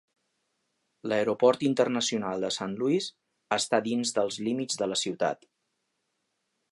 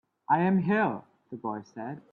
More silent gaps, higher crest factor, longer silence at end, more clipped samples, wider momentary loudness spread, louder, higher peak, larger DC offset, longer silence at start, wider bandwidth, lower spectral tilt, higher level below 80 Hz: neither; about the same, 20 dB vs 18 dB; first, 1.35 s vs 0.15 s; neither; second, 7 LU vs 16 LU; about the same, -28 LUFS vs -28 LUFS; about the same, -8 dBFS vs -10 dBFS; neither; first, 1.05 s vs 0.3 s; first, 11.5 kHz vs 6 kHz; second, -3.5 dB/octave vs -9 dB/octave; about the same, -74 dBFS vs -72 dBFS